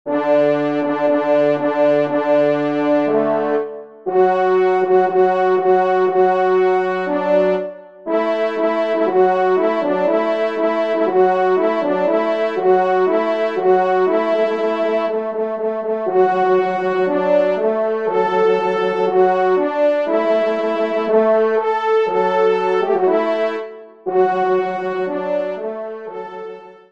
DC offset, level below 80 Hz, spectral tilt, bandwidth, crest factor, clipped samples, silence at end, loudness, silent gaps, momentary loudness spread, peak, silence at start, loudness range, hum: 0.3%; -70 dBFS; -7 dB/octave; 7 kHz; 14 dB; under 0.1%; 0.2 s; -17 LUFS; none; 7 LU; -2 dBFS; 0.05 s; 2 LU; none